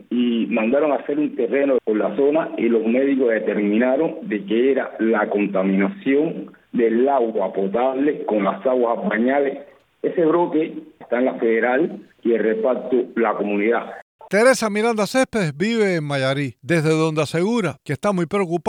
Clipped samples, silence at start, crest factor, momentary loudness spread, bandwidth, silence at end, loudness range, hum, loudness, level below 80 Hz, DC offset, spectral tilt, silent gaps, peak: under 0.1%; 0.1 s; 16 dB; 6 LU; 15.5 kHz; 0 s; 1 LU; none; -20 LUFS; -64 dBFS; under 0.1%; -6 dB/octave; 14.02-14.19 s; -4 dBFS